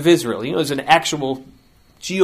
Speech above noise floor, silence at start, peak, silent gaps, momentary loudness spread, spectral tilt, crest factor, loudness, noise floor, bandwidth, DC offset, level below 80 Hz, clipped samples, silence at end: 31 dB; 0 s; 0 dBFS; none; 13 LU; -4 dB/octave; 18 dB; -18 LUFS; -49 dBFS; 15.5 kHz; under 0.1%; -54 dBFS; under 0.1%; 0 s